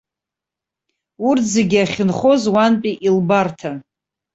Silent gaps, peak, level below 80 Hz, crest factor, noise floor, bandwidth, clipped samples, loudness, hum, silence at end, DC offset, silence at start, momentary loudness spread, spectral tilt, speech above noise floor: none; -2 dBFS; -56 dBFS; 16 dB; -86 dBFS; 8.2 kHz; under 0.1%; -16 LUFS; none; 0.55 s; under 0.1%; 1.2 s; 9 LU; -5.5 dB/octave; 70 dB